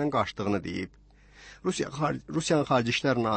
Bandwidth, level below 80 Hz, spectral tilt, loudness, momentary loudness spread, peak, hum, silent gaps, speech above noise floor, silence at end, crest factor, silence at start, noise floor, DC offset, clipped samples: 8.8 kHz; -56 dBFS; -5 dB/octave; -28 LUFS; 10 LU; -12 dBFS; 50 Hz at -50 dBFS; none; 25 dB; 0 s; 16 dB; 0 s; -52 dBFS; under 0.1%; under 0.1%